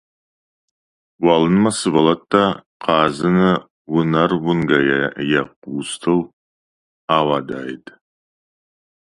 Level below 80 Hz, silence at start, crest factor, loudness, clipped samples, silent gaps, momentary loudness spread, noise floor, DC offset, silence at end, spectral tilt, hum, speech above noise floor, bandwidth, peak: -52 dBFS; 1.2 s; 18 dB; -18 LUFS; under 0.1%; 2.66-2.80 s, 3.70-3.85 s, 5.56-5.62 s, 6.33-7.08 s; 12 LU; under -90 dBFS; under 0.1%; 1.25 s; -5.5 dB/octave; none; over 73 dB; 11.5 kHz; 0 dBFS